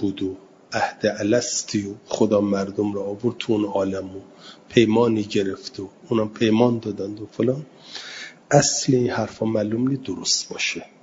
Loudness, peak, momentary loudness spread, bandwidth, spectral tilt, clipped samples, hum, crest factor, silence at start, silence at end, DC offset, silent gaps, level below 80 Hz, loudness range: -22 LUFS; 0 dBFS; 15 LU; 7.8 kHz; -4.5 dB/octave; under 0.1%; none; 22 dB; 0 s; 0.15 s; under 0.1%; none; -60 dBFS; 2 LU